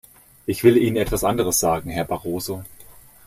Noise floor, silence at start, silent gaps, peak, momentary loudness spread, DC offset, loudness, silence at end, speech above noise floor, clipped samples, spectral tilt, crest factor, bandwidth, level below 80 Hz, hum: -46 dBFS; 0.5 s; none; -2 dBFS; 13 LU; under 0.1%; -21 LUFS; 0.35 s; 26 dB; under 0.1%; -5 dB/octave; 20 dB; 15.5 kHz; -42 dBFS; none